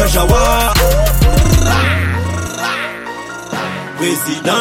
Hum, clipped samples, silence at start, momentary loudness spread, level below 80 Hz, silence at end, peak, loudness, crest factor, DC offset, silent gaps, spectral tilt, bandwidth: none; under 0.1%; 0 s; 11 LU; -18 dBFS; 0 s; 0 dBFS; -14 LUFS; 12 dB; under 0.1%; none; -4.5 dB/octave; 16.5 kHz